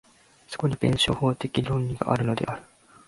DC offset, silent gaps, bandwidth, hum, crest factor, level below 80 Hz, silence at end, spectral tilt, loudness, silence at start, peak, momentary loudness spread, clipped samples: under 0.1%; none; 11.5 kHz; none; 22 dB; -48 dBFS; 0.45 s; -6 dB/octave; -26 LUFS; 0.5 s; -6 dBFS; 9 LU; under 0.1%